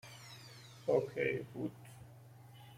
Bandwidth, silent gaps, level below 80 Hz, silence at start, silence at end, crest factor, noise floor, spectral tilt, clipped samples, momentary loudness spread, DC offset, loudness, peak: 16 kHz; none; -74 dBFS; 0.05 s; 0 s; 22 dB; -57 dBFS; -6 dB/octave; under 0.1%; 22 LU; under 0.1%; -38 LUFS; -20 dBFS